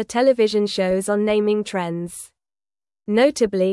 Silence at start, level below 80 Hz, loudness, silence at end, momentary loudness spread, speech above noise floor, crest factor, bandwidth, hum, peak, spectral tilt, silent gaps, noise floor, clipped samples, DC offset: 0 s; -56 dBFS; -20 LUFS; 0 s; 15 LU; over 71 dB; 16 dB; 12 kHz; none; -4 dBFS; -5 dB/octave; none; under -90 dBFS; under 0.1%; under 0.1%